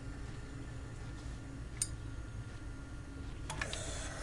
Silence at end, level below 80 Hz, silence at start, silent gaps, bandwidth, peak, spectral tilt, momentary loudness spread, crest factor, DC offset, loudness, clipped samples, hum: 0 s; -48 dBFS; 0 s; none; 11.5 kHz; -18 dBFS; -3.5 dB/octave; 9 LU; 24 dB; 0.1%; -44 LUFS; under 0.1%; none